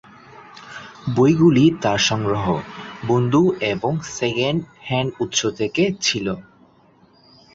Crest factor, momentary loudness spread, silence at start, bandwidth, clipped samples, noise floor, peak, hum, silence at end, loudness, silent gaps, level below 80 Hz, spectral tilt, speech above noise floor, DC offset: 16 dB; 16 LU; 0.35 s; 7.8 kHz; under 0.1%; -54 dBFS; -4 dBFS; none; 1.15 s; -19 LUFS; none; -50 dBFS; -5 dB/octave; 35 dB; under 0.1%